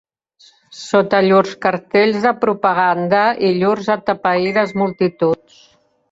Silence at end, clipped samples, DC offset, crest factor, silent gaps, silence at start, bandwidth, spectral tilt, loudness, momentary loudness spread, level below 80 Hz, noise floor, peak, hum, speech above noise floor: 0.8 s; under 0.1%; under 0.1%; 14 dB; none; 0.7 s; 7.8 kHz; -6 dB/octave; -16 LUFS; 5 LU; -60 dBFS; -52 dBFS; -2 dBFS; none; 36 dB